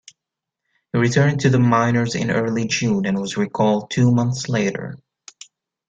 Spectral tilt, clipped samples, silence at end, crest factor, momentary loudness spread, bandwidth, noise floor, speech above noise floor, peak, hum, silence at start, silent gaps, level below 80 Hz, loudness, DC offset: -6 dB/octave; under 0.1%; 0.95 s; 16 dB; 8 LU; 8.8 kHz; -84 dBFS; 66 dB; -4 dBFS; none; 0.95 s; none; -54 dBFS; -19 LUFS; under 0.1%